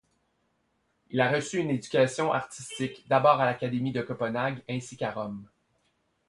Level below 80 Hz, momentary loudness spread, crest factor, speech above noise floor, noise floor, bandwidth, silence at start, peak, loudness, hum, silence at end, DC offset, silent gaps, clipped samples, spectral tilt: -66 dBFS; 13 LU; 22 dB; 46 dB; -74 dBFS; 11.5 kHz; 1.1 s; -8 dBFS; -28 LUFS; none; 0.85 s; under 0.1%; none; under 0.1%; -5.5 dB/octave